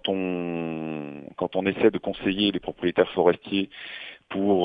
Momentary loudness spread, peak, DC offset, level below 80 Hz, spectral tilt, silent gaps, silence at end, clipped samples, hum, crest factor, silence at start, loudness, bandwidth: 13 LU; -6 dBFS; under 0.1%; -58 dBFS; -8.5 dB/octave; none; 0 s; under 0.1%; none; 20 dB; 0.05 s; -26 LUFS; 5 kHz